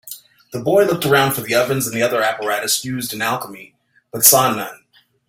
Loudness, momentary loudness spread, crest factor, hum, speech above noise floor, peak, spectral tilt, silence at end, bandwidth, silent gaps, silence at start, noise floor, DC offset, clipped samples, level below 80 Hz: -16 LUFS; 20 LU; 18 dB; none; 21 dB; 0 dBFS; -3 dB/octave; 0.55 s; 16.5 kHz; none; 0.05 s; -39 dBFS; under 0.1%; under 0.1%; -58 dBFS